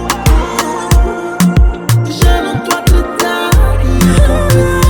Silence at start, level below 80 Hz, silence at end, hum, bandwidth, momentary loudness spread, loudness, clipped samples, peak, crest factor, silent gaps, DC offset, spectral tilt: 0 s; -12 dBFS; 0 s; none; 19.5 kHz; 4 LU; -12 LUFS; 0.1%; 0 dBFS; 10 dB; none; under 0.1%; -5.5 dB/octave